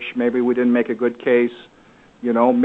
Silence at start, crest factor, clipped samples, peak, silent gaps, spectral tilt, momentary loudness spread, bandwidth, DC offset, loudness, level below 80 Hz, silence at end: 0 s; 16 dB; under 0.1%; -2 dBFS; none; -8 dB/octave; 6 LU; 4 kHz; under 0.1%; -19 LUFS; -64 dBFS; 0 s